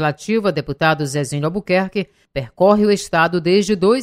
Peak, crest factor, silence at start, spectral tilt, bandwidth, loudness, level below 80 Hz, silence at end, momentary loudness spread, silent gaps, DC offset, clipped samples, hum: 0 dBFS; 16 dB; 0 s; -5.5 dB/octave; 15 kHz; -17 LUFS; -48 dBFS; 0 s; 10 LU; none; under 0.1%; under 0.1%; none